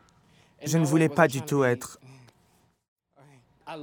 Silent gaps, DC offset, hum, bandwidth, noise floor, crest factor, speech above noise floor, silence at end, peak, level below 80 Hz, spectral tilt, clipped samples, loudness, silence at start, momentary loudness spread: 2.88-2.96 s; under 0.1%; none; 19 kHz; -65 dBFS; 24 dB; 42 dB; 0 s; -4 dBFS; -70 dBFS; -6 dB/octave; under 0.1%; -24 LUFS; 0.6 s; 17 LU